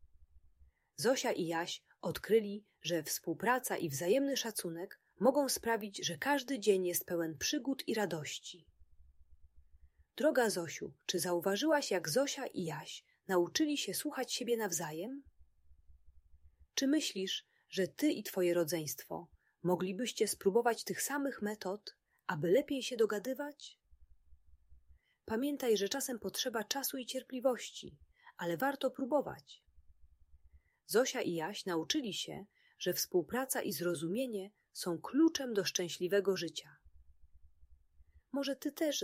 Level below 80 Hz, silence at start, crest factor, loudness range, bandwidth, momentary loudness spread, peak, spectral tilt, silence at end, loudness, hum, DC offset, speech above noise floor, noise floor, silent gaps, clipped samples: -70 dBFS; 0.2 s; 20 dB; 4 LU; 16 kHz; 12 LU; -18 dBFS; -3.5 dB/octave; 0 s; -36 LUFS; none; under 0.1%; 32 dB; -67 dBFS; none; under 0.1%